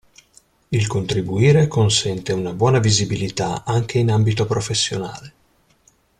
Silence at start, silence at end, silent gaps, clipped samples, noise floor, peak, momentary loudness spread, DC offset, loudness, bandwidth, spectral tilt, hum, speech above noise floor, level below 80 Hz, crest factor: 0.7 s; 0.9 s; none; under 0.1%; -58 dBFS; -4 dBFS; 9 LU; under 0.1%; -19 LUFS; 11 kHz; -5 dB/octave; none; 40 dB; -48 dBFS; 16 dB